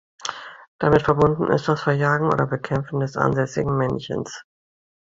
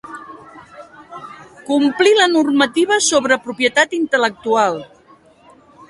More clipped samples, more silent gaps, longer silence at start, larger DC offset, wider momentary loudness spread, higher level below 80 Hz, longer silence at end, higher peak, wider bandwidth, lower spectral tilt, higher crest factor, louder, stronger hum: neither; first, 0.68-0.79 s vs none; first, 0.2 s vs 0.05 s; neither; second, 13 LU vs 22 LU; first, -48 dBFS vs -62 dBFS; second, 0.65 s vs 1.05 s; about the same, -2 dBFS vs 0 dBFS; second, 7.8 kHz vs 11.5 kHz; first, -6.5 dB/octave vs -2 dB/octave; about the same, 20 dB vs 18 dB; second, -21 LUFS vs -15 LUFS; neither